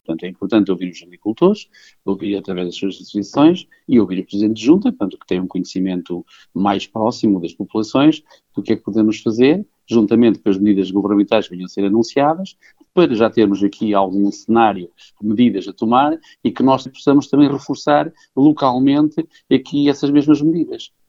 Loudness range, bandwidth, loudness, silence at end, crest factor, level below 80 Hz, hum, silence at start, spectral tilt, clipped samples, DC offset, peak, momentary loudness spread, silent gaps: 3 LU; 7.6 kHz; -17 LUFS; 0.2 s; 16 dB; -56 dBFS; none; 0.1 s; -7 dB/octave; under 0.1%; under 0.1%; 0 dBFS; 11 LU; none